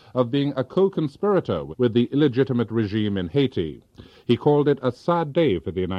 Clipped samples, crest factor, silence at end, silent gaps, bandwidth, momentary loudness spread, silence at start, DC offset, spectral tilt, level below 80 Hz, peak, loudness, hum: under 0.1%; 16 dB; 0 s; none; 7.2 kHz; 5 LU; 0.15 s; under 0.1%; -9 dB/octave; -54 dBFS; -6 dBFS; -22 LUFS; none